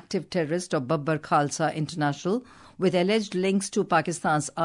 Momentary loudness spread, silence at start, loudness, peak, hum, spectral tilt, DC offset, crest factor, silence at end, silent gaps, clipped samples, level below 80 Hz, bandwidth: 4 LU; 0.1 s; -26 LUFS; -10 dBFS; none; -5 dB/octave; under 0.1%; 16 dB; 0 s; none; under 0.1%; -66 dBFS; 11 kHz